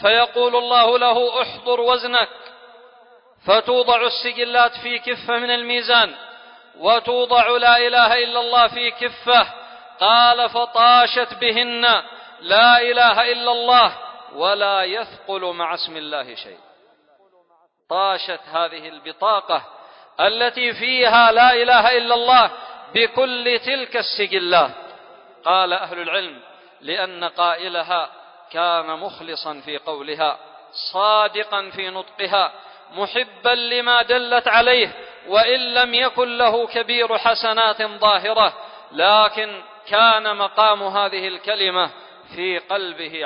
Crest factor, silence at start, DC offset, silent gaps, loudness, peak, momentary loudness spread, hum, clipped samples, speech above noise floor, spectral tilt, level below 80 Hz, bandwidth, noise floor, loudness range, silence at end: 18 dB; 0 s; under 0.1%; none; -17 LUFS; -2 dBFS; 15 LU; none; under 0.1%; 41 dB; -6.5 dB/octave; -60 dBFS; 5.4 kHz; -59 dBFS; 9 LU; 0 s